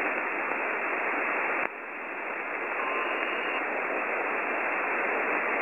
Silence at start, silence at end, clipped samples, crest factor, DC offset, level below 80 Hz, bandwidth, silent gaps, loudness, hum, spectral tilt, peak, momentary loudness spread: 0 s; 0 s; under 0.1%; 22 dB; under 0.1%; -78 dBFS; 16.5 kHz; none; -29 LUFS; none; -4.5 dB/octave; -8 dBFS; 6 LU